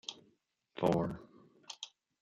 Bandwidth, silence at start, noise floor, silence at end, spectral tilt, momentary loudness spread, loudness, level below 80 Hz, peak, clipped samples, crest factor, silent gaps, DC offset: 12.5 kHz; 0.1 s; -74 dBFS; 0.35 s; -6 dB/octave; 20 LU; -37 LUFS; -64 dBFS; -16 dBFS; under 0.1%; 24 dB; none; under 0.1%